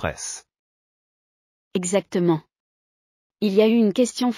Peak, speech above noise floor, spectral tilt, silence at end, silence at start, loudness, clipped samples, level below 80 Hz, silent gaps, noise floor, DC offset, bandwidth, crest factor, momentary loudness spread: -6 dBFS; over 69 dB; -5 dB/octave; 0 s; 0 s; -22 LUFS; under 0.1%; -56 dBFS; 0.59-1.71 s, 2.60-3.30 s; under -90 dBFS; under 0.1%; 14 kHz; 18 dB; 14 LU